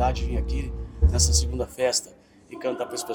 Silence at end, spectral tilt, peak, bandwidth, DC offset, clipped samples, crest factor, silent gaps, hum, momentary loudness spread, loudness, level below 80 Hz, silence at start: 0 s; -4 dB/octave; -6 dBFS; 18.5 kHz; under 0.1%; under 0.1%; 18 dB; none; none; 13 LU; -25 LUFS; -28 dBFS; 0 s